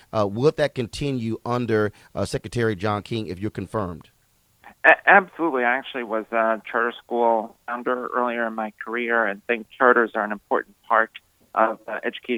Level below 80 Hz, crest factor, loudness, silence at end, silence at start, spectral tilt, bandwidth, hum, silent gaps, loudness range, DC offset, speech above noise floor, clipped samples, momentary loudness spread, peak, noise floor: -56 dBFS; 24 dB; -23 LUFS; 0 s; 0.15 s; -6 dB/octave; 16 kHz; none; none; 6 LU; under 0.1%; 40 dB; under 0.1%; 12 LU; 0 dBFS; -63 dBFS